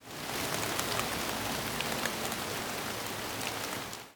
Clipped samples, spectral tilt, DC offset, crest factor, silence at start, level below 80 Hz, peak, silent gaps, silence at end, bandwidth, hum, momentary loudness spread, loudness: under 0.1%; -2.5 dB/octave; under 0.1%; 24 dB; 0 s; -58 dBFS; -12 dBFS; none; 0 s; over 20 kHz; none; 4 LU; -34 LUFS